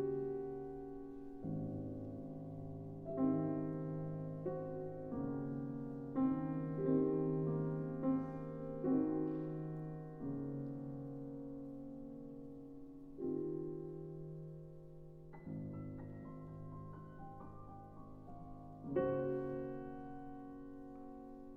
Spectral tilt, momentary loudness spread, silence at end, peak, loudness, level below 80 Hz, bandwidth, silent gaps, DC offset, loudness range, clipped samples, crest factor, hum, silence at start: -11.5 dB/octave; 17 LU; 0 s; -24 dBFS; -43 LUFS; -62 dBFS; 3.2 kHz; none; under 0.1%; 12 LU; under 0.1%; 18 dB; none; 0 s